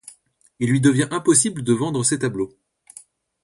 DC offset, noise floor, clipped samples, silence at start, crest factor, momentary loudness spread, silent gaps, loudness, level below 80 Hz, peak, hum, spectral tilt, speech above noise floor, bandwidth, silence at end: under 0.1%; -56 dBFS; under 0.1%; 0.6 s; 20 dB; 10 LU; none; -20 LUFS; -58 dBFS; -2 dBFS; none; -4.5 dB/octave; 36 dB; 11.5 kHz; 0.95 s